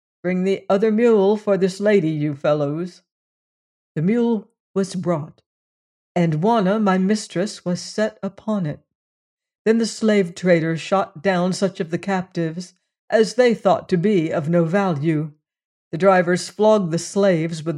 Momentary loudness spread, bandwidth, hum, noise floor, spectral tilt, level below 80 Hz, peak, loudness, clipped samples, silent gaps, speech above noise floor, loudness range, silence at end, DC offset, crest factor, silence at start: 10 LU; 11.5 kHz; none; under -90 dBFS; -6.5 dB/octave; -68 dBFS; -4 dBFS; -20 LUFS; under 0.1%; 3.12-3.95 s, 4.60-4.74 s, 5.46-6.15 s, 8.95-9.37 s, 9.55-9.65 s, 12.99-13.08 s, 15.65-15.91 s; over 71 dB; 4 LU; 0 s; under 0.1%; 16 dB; 0.25 s